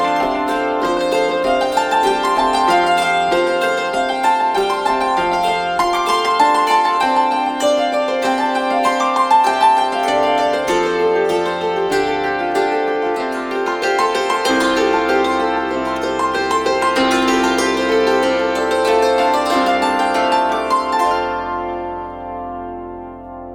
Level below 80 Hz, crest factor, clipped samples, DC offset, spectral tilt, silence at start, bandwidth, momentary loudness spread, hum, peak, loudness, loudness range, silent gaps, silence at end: -46 dBFS; 14 dB; under 0.1%; under 0.1%; -3 dB/octave; 0 s; 19.5 kHz; 6 LU; none; -2 dBFS; -16 LUFS; 2 LU; none; 0 s